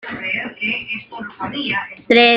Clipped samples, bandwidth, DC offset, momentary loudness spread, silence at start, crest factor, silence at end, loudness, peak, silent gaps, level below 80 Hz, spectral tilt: under 0.1%; 7.2 kHz; under 0.1%; 12 LU; 0.05 s; 18 dB; 0 s; -20 LUFS; -2 dBFS; none; -58 dBFS; -5.5 dB/octave